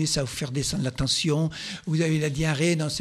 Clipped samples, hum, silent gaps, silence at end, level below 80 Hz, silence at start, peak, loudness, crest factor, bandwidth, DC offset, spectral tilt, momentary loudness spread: under 0.1%; none; none; 0 s; -46 dBFS; 0 s; -12 dBFS; -25 LUFS; 14 dB; 14 kHz; under 0.1%; -4.5 dB/octave; 6 LU